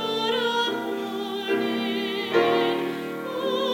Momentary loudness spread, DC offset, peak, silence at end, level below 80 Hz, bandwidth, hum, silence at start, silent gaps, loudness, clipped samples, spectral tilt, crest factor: 8 LU; under 0.1%; -8 dBFS; 0 s; -72 dBFS; 17 kHz; none; 0 s; none; -25 LUFS; under 0.1%; -4.5 dB/octave; 16 dB